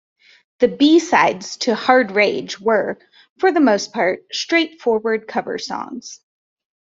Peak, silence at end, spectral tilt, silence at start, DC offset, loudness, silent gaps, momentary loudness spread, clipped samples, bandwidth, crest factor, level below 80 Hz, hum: -2 dBFS; 0.7 s; -3.5 dB/octave; 0.6 s; under 0.1%; -18 LUFS; 3.30-3.36 s; 13 LU; under 0.1%; 7.8 kHz; 18 dB; -64 dBFS; none